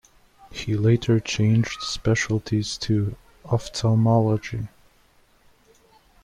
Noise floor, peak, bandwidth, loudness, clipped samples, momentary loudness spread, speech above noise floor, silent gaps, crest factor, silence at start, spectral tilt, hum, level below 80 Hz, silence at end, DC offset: -58 dBFS; -8 dBFS; 10.5 kHz; -23 LUFS; under 0.1%; 14 LU; 37 dB; none; 16 dB; 0.5 s; -6 dB/octave; none; -48 dBFS; 1.55 s; under 0.1%